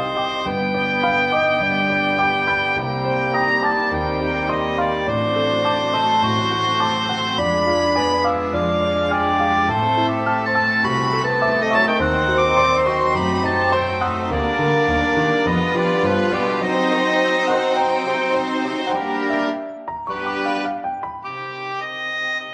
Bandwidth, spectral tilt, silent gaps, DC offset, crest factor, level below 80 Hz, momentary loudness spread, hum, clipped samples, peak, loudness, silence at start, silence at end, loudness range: 11 kHz; -5.5 dB/octave; none; under 0.1%; 14 dB; -44 dBFS; 6 LU; none; under 0.1%; -6 dBFS; -19 LUFS; 0 s; 0 s; 4 LU